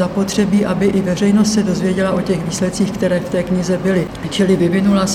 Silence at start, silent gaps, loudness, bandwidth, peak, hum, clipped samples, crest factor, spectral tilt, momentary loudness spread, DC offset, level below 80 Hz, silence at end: 0 s; none; -16 LUFS; 14 kHz; -2 dBFS; none; under 0.1%; 14 dB; -6 dB/octave; 5 LU; 0.1%; -40 dBFS; 0 s